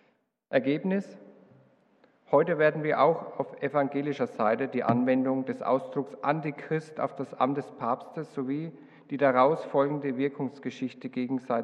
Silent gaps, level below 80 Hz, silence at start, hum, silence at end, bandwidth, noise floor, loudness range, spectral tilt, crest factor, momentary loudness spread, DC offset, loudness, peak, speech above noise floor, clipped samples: none; -82 dBFS; 0.5 s; none; 0 s; 8.8 kHz; -70 dBFS; 4 LU; -8 dB/octave; 20 dB; 11 LU; under 0.1%; -28 LUFS; -10 dBFS; 42 dB; under 0.1%